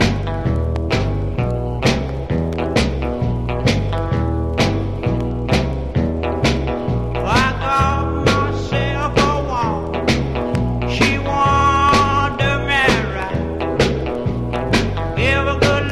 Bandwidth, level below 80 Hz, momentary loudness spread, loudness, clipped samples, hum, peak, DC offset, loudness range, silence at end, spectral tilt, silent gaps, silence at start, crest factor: 13 kHz; -26 dBFS; 7 LU; -18 LUFS; under 0.1%; none; -2 dBFS; under 0.1%; 4 LU; 0 s; -6 dB/octave; none; 0 s; 16 dB